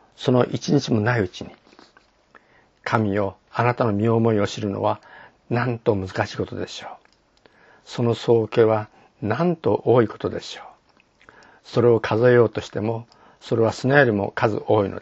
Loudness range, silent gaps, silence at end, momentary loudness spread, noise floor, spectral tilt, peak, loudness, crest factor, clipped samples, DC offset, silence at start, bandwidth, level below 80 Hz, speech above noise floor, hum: 5 LU; none; 0 s; 15 LU; -58 dBFS; -7 dB/octave; 0 dBFS; -21 LUFS; 22 dB; under 0.1%; under 0.1%; 0.2 s; 8 kHz; -60 dBFS; 38 dB; none